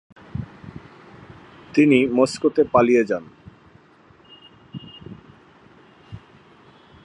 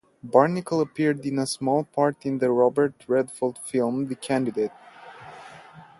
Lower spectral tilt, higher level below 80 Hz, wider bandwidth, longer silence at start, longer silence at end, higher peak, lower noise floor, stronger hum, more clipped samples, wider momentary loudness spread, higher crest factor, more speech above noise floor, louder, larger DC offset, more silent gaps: about the same, -6 dB/octave vs -6 dB/octave; first, -54 dBFS vs -68 dBFS; about the same, 11.5 kHz vs 11.5 kHz; about the same, 0.35 s vs 0.25 s; first, 0.85 s vs 0.15 s; about the same, -2 dBFS vs -2 dBFS; first, -52 dBFS vs -47 dBFS; neither; neither; first, 27 LU vs 20 LU; about the same, 22 dB vs 22 dB; first, 35 dB vs 23 dB; first, -18 LUFS vs -24 LUFS; neither; neither